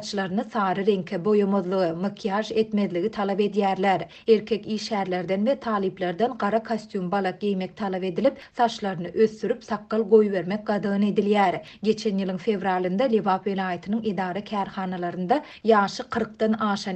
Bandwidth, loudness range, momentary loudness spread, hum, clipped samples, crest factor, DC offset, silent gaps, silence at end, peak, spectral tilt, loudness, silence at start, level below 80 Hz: 8.6 kHz; 3 LU; 7 LU; none; under 0.1%; 18 dB; under 0.1%; none; 0 s; -6 dBFS; -6.5 dB/octave; -25 LUFS; 0 s; -64 dBFS